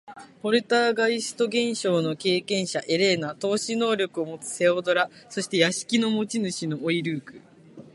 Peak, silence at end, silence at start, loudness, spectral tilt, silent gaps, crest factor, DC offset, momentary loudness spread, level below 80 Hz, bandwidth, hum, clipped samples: -4 dBFS; 0.05 s; 0.05 s; -25 LUFS; -4 dB/octave; none; 20 dB; under 0.1%; 7 LU; -72 dBFS; 11.5 kHz; none; under 0.1%